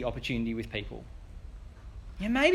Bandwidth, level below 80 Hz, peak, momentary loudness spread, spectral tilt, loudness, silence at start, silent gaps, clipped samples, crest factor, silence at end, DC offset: 13 kHz; -44 dBFS; -10 dBFS; 18 LU; -5.5 dB/octave; -33 LUFS; 0 s; none; under 0.1%; 22 dB; 0 s; under 0.1%